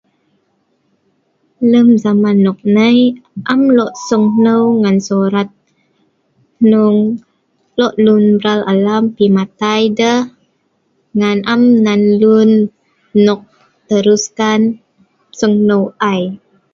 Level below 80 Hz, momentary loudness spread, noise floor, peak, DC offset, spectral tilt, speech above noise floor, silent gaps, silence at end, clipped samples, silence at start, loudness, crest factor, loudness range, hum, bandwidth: -58 dBFS; 9 LU; -61 dBFS; 0 dBFS; under 0.1%; -6 dB/octave; 50 dB; none; 0.35 s; under 0.1%; 1.6 s; -12 LUFS; 12 dB; 3 LU; none; 7.4 kHz